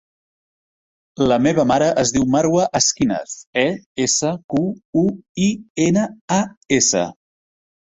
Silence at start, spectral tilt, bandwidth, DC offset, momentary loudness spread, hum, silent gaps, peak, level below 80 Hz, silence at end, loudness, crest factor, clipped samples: 1.2 s; -4 dB/octave; 8.4 kHz; under 0.1%; 6 LU; none; 3.47-3.53 s, 3.86-3.95 s, 4.44-4.49 s, 4.85-4.93 s, 5.29-5.35 s, 5.70-5.75 s, 6.21-6.28 s, 6.57-6.61 s; -2 dBFS; -50 dBFS; 0.7 s; -18 LUFS; 16 dB; under 0.1%